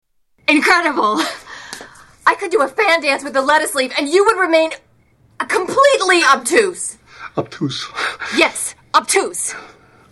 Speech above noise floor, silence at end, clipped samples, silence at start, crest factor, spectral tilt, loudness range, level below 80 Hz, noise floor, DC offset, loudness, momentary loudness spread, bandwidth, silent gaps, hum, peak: 38 dB; 0.45 s; under 0.1%; 0.5 s; 16 dB; -2.5 dB/octave; 3 LU; -58 dBFS; -53 dBFS; under 0.1%; -15 LUFS; 15 LU; 16.5 kHz; none; none; -2 dBFS